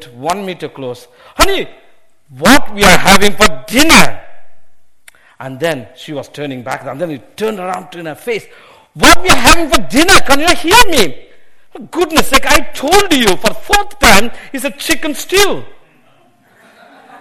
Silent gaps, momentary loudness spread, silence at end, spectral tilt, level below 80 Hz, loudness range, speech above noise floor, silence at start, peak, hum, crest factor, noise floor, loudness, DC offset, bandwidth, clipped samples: none; 17 LU; 0 s; -2.5 dB/octave; -26 dBFS; 12 LU; 40 dB; 0 s; 0 dBFS; none; 12 dB; -50 dBFS; -10 LUFS; under 0.1%; over 20 kHz; 1%